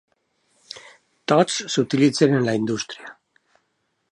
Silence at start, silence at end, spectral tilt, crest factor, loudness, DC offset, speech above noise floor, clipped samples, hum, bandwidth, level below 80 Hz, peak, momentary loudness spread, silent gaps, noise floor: 0.75 s; 1 s; -5 dB/octave; 20 dB; -20 LUFS; under 0.1%; 52 dB; under 0.1%; none; 11 kHz; -68 dBFS; -2 dBFS; 22 LU; none; -72 dBFS